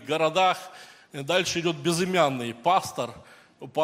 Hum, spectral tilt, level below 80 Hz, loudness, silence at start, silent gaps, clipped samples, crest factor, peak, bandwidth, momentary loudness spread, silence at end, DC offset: none; -4 dB/octave; -68 dBFS; -25 LUFS; 0 s; none; under 0.1%; 20 dB; -6 dBFS; 16 kHz; 15 LU; 0 s; under 0.1%